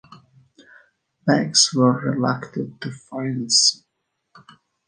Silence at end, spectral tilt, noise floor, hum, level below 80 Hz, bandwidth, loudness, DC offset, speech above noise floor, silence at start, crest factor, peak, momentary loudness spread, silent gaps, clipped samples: 1.15 s; -3 dB/octave; -76 dBFS; none; -68 dBFS; 10 kHz; -19 LUFS; under 0.1%; 55 dB; 0.1 s; 20 dB; -2 dBFS; 16 LU; none; under 0.1%